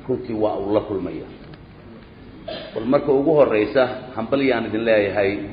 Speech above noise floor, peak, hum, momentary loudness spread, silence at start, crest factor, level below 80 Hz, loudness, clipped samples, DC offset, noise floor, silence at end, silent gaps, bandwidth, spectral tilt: 22 dB; -2 dBFS; none; 17 LU; 0 s; 18 dB; -50 dBFS; -20 LUFS; under 0.1%; under 0.1%; -42 dBFS; 0 s; none; 5.2 kHz; -10 dB/octave